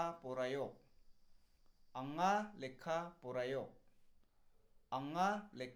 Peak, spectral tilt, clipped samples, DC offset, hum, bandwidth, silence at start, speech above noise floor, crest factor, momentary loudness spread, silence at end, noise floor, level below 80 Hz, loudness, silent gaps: -24 dBFS; -5.5 dB/octave; under 0.1%; under 0.1%; none; 17.5 kHz; 0 s; 28 dB; 20 dB; 12 LU; 0 s; -69 dBFS; -72 dBFS; -42 LUFS; none